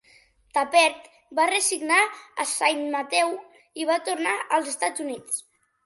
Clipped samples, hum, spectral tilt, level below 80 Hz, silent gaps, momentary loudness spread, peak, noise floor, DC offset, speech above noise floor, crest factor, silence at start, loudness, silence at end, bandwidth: under 0.1%; none; 0 dB/octave; -74 dBFS; none; 11 LU; -6 dBFS; -58 dBFS; under 0.1%; 34 dB; 20 dB; 0.55 s; -24 LUFS; 0.45 s; 12 kHz